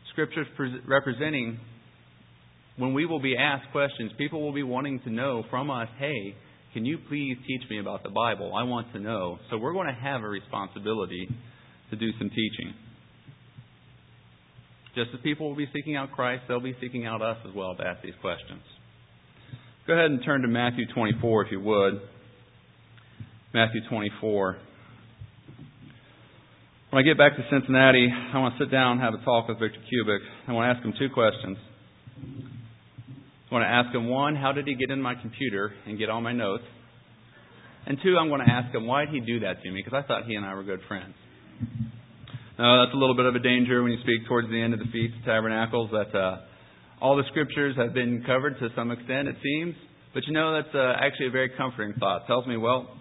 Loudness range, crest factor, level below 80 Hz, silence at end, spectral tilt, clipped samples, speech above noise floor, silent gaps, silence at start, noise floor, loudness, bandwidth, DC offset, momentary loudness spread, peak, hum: 10 LU; 24 dB; -60 dBFS; 0 s; -10 dB/octave; under 0.1%; 29 dB; none; 0.05 s; -56 dBFS; -26 LUFS; 4 kHz; under 0.1%; 15 LU; -4 dBFS; none